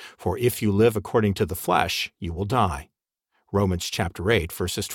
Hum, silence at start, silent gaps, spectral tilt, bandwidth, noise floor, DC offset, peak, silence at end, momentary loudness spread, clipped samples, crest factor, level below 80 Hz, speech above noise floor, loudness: none; 0 s; none; -5 dB/octave; 18 kHz; -74 dBFS; under 0.1%; -4 dBFS; 0 s; 8 LU; under 0.1%; 20 dB; -44 dBFS; 50 dB; -24 LUFS